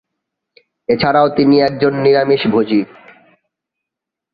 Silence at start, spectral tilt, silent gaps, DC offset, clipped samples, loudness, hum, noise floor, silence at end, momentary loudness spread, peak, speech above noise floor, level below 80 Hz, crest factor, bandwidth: 0.9 s; -9 dB/octave; none; under 0.1%; under 0.1%; -13 LUFS; none; -83 dBFS; 1.5 s; 7 LU; -2 dBFS; 70 dB; -52 dBFS; 14 dB; 5.2 kHz